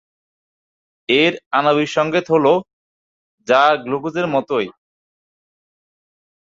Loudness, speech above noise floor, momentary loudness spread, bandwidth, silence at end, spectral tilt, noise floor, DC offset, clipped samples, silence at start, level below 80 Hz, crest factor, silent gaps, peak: -17 LUFS; over 74 dB; 8 LU; 7.8 kHz; 1.85 s; -5 dB/octave; under -90 dBFS; under 0.1%; under 0.1%; 1.1 s; -64 dBFS; 18 dB; 1.46-1.51 s, 2.73-3.38 s; -2 dBFS